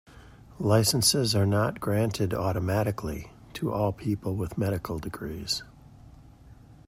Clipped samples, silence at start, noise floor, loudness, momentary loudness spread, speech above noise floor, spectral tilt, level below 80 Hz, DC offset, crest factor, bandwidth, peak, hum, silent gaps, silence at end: under 0.1%; 0.1 s; -51 dBFS; -27 LUFS; 13 LU; 24 dB; -4.5 dB/octave; -50 dBFS; under 0.1%; 20 dB; 16 kHz; -8 dBFS; none; none; 0.15 s